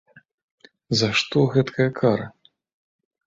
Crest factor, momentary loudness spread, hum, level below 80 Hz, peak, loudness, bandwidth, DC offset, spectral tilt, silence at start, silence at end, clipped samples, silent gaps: 20 dB; 6 LU; none; -58 dBFS; -4 dBFS; -21 LUFS; 7.8 kHz; under 0.1%; -5.5 dB/octave; 0.9 s; 0.95 s; under 0.1%; none